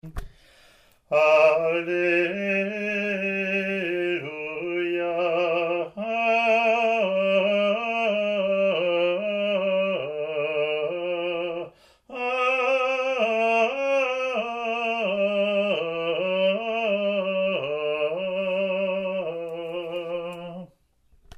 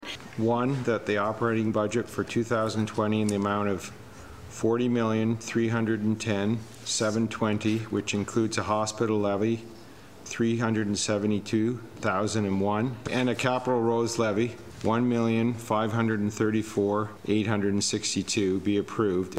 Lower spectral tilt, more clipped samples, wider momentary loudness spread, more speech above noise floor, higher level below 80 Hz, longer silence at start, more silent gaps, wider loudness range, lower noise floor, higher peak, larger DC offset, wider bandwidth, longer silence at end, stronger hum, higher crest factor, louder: about the same, -5.5 dB/octave vs -5.5 dB/octave; neither; first, 10 LU vs 5 LU; first, 39 dB vs 21 dB; first, -54 dBFS vs -60 dBFS; about the same, 0.05 s vs 0 s; neither; about the same, 4 LU vs 2 LU; first, -61 dBFS vs -48 dBFS; first, -6 dBFS vs -10 dBFS; second, under 0.1% vs 0.2%; second, 9 kHz vs 15 kHz; first, 0.7 s vs 0 s; neither; about the same, 18 dB vs 16 dB; first, -24 LUFS vs -27 LUFS